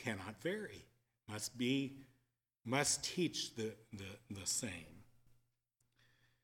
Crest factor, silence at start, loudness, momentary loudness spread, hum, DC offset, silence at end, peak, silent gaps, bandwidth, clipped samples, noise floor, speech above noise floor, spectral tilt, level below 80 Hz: 24 dB; 0 s; -40 LUFS; 16 LU; none; under 0.1%; 1.1 s; -20 dBFS; none; 17.5 kHz; under 0.1%; -83 dBFS; 41 dB; -3 dB/octave; -74 dBFS